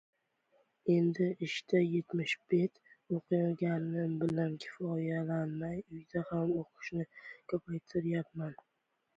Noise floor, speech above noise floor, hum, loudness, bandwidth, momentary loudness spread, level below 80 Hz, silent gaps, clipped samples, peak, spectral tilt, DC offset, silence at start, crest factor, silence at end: -74 dBFS; 39 dB; none; -35 LUFS; 7.8 kHz; 10 LU; -72 dBFS; none; under 0.1%; -18 dBFS; -7.5 dB/octave; under 0.1%; 0.85 s; 18 dB; 0.65 s